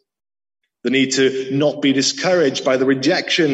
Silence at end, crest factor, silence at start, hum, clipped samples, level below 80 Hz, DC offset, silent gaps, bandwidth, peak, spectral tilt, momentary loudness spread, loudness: 0 s; 14 dB; 0.85 s; none; under 0.1%; -64 dBFS; under 0.1%; none; 8.4 kHz; -4 dBFS; -4 dB/octave; 3 LU; -17 LUFS